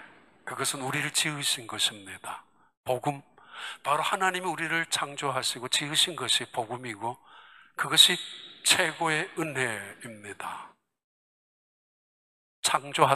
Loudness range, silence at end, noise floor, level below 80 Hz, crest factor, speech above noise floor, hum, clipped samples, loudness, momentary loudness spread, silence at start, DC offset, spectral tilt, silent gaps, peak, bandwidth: 9 LU; 0 s; -54 dBFS; -76 dBFS; 26 dB; 25 dB; none; under 0.1%; -26 LUFS; 18 LU; 0 s; under 0.1%; -1.5 dB/octave; 2.77-2.84 s, 11.04-12.63 s; -4 dBFS; 15 kHz